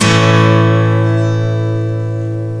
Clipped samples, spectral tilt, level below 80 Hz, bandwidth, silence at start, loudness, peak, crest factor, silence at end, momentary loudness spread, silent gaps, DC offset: under 0.1%; -6 dB/octave; -44 dBFS; 10.5 kHz; 0 s; -13 LUFS; 0 dBFS; 12 dB; 0 s; 9 LU; none; 0.5%